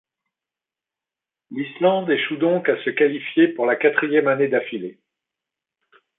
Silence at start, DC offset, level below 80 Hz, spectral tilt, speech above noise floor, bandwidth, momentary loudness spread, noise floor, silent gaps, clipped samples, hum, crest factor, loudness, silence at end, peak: 1.5 s; under 0.1%; -74 dBFS; -10 dB/octave; 69 dB; 4 kHz; 12 LU; -89 dBFS; none; under 0.1%; none; 18 dB; -20 LUFS; 1.25 s; -4 dBFS